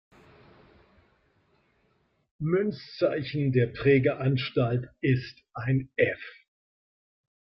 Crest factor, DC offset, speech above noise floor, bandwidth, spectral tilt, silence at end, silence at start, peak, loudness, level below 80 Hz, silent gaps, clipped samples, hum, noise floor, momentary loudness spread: 20 dB; under 0.1%; 44 dB; 5.8 kHz; -9.5 dB/octave; 1.15 s; 2.4 s; -10 dBFS; -27 LUFS; -60 dBFS; none; under 0.1%; none; -70 dBFS; 12 LU